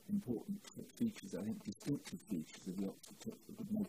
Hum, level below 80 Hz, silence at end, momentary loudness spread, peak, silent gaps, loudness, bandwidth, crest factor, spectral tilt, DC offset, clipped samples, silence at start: none; -74 dBFS; 0 s; 10 LU; -28 dBFS; none; -45 LUFS; 15.5 kHz; 16 dB; -6.5 dB/octave; under 0.1%; under 0.1%; 0 s